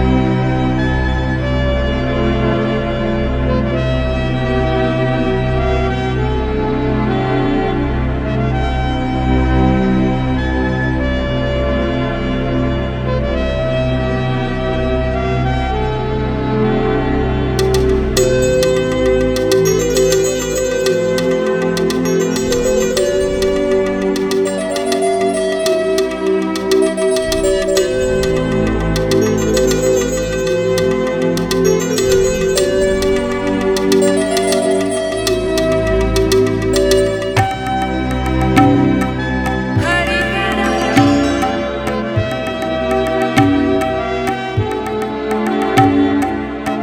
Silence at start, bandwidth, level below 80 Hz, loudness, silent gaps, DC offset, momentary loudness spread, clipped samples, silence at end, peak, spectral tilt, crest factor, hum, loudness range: 0 s; 18.5 kHz; -24 dBFS; -15 LUFS; none; under 0.1%; 5 LU; under 0.1%; 0 s; 0 dBFS; -5.5 dB/octave; 14 dB; none; 3 LU